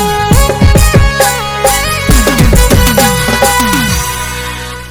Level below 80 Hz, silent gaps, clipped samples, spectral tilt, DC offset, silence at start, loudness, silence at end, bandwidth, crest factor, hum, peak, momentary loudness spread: -14 dBFS; none; 3%; -4 dB/octave; under 0.1%; 0 s; -9 LUFS; 0 s; over 20 kHz; 8 dB; none; 0 dBFS; 8 LU